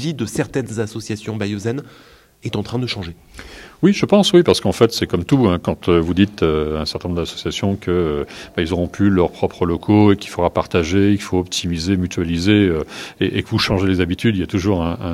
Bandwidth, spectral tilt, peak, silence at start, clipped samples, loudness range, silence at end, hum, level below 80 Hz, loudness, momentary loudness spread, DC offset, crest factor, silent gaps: 14.5 kHz; -6 dB/octave; 0 dBFS; 0 s; under 0.1%; 5 LU; 0 s; none; -42 dBFS; -18 LUFS; 11 LU; under 0.1%; 18 dB; none